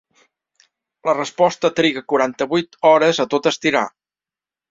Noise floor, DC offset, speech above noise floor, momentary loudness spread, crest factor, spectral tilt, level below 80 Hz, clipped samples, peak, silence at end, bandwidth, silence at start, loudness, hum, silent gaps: under -90 dBFS; under 0.1%; over 73 dB; 7 LU; 18 dB; -4 dB/octave; -64 dBFS; under 0.1%; -2 dBFS; 0.8 s; 7.8 kHz; 1.05 s; -18 LUFS; none; none